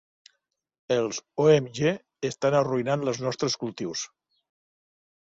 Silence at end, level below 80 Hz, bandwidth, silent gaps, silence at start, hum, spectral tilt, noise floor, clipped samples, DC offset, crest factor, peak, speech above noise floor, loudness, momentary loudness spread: 1.15 s; -66 dBFS; 7.8 kHz; none; 0.9 s; none; -5 dB/octave; -75 dBFS; under 0.1%; under 0.1%; 20 dB; -8 dBFS; 50 dB; -26 LUFS; 11 LU